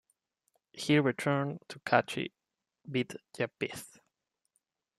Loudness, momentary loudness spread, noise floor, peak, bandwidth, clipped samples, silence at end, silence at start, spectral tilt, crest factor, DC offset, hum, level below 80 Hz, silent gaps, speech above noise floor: -32 LUFS; 14 LU; -82 dBFS; -10 dBFS; 14 kHz; under 0.1%; 1.15 s; 0.75 s; -5.5 dB/octave; 26 dB; under 0.1%; none; -76 dBFS; none; 51 dB